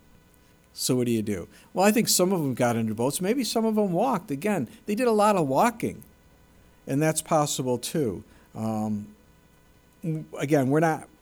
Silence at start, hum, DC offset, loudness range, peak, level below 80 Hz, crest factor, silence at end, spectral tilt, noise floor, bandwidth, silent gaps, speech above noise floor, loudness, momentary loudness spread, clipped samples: 0.75 s; none; under 0.1%; 5 LU; -8 dBFS; -60 dBFS; 18 dB; 0.15 s; -5 dB/octave; -58 dBFS; over 20 kHz; none; 33 dB; -25 LUFS; 13 LU; under 0.1%